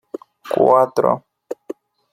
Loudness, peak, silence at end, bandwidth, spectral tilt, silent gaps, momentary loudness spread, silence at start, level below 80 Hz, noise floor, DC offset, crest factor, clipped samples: -17 LUFS; -2 dBFS; 0.4 s; 15 kHz; -7 dB/octave; none; 22 LU; 0.45 s; -64 dBFS; -36 dBFS; under 0.1%; 18 dB; under 0.1%